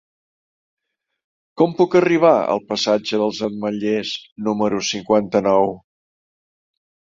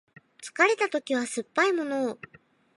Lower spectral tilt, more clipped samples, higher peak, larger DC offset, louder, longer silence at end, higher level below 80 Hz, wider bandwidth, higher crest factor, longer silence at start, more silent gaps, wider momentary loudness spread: first, -5 dB/octave vs -2.5 dB/octave; neither; first, -2 dBFS vs -6 dBFS; neither; first, -19 LUFS vs -26 LUFS; first, 1.25 s vs 0.6 s; first, -60 dBFS vs -78 dBFS; second, 7.8 kHz vs 11.5 kHz; about the same, 18 dB vs 22 dB; first, 1.55 s vs 0.4 s; first, 4.32-4.36 s vs none; second, 9 LU vs 17 LU